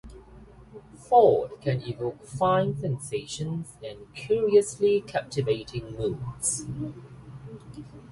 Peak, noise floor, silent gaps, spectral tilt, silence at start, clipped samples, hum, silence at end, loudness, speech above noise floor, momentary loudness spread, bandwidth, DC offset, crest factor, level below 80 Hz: -6 dBFS; -49 dBFS; none; -5 dB/octave; 0.05 s; under 0.1%; none; 0 s; -26 LUFS; 23 dB; 22 LU; 11.5 kHz; under 0.1%; 20 dB; -54 dBFS